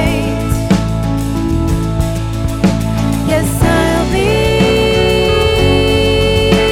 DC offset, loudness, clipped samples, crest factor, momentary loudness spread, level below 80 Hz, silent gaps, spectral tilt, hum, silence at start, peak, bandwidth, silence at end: under 0.1%; -13 LUFS; under 0.1%; 12 dB; 5 LU; -22 dBFS; none; -5.5 dB/octave; none; 0 s; 0 dBFS; 17.5 kHz; 0 s